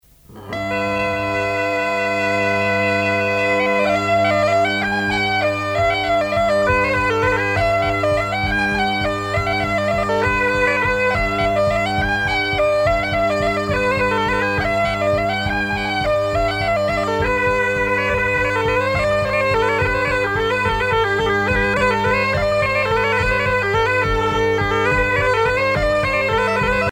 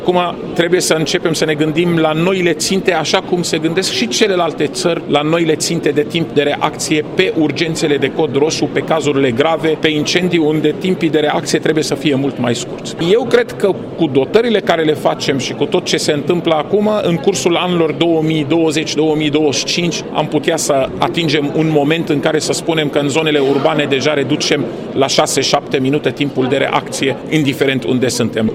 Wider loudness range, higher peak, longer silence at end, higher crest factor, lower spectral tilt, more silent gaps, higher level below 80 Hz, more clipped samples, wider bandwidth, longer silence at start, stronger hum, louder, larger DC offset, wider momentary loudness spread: about the same, 1 LU vs 1 LU; second, -4 dBFS vs 0 dBFS; about the same, 0 s vs 0 s; about the same, 14 dB vs 14 dB; about the same, -5.5 dB/octave vs -4.5 dB/octave; neither; first, -34 dBFS vs -48 dBFS; neither; about the same, 16.5 kHz vs 16 kHz; first, 0.3 s vs 0 s; neither; second, -18 LUFS vs -14 LUFS; neither; about the same, 3 LU vs 4 LU